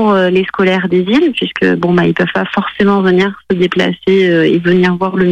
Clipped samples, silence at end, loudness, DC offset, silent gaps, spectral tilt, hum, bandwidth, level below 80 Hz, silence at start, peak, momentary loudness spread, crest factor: under 0.1%; 0 s; -12 LUFS; under 0.1%; none; -7.5 dB/octave; none; 8.6 kHz; -46 dBFS; 0 s; -2 dBFS; 4 LU; 10 dB